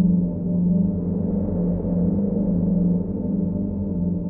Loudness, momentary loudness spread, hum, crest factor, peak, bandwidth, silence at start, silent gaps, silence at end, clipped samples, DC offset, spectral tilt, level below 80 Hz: -22 LUFS; 4 LU; none; 12 dB; -10 dBFS; 1.4 kHz; 0 s; none; 0 s; under 0.1%; under 0.1%; -16.5 dB/octave; -38 dBFS